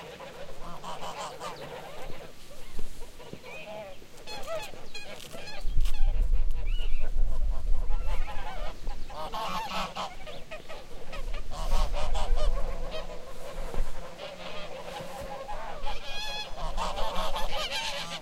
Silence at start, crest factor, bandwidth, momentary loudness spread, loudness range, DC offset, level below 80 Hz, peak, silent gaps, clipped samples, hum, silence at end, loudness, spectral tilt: 0 s; 16 dB; 9.4 kHz; 11 LU; 7 LU; under 0.1%; -30 dBFS; -10 dBFS; none; under 0.1%; none; 0 s; -37 LUFS; -4 dB/octave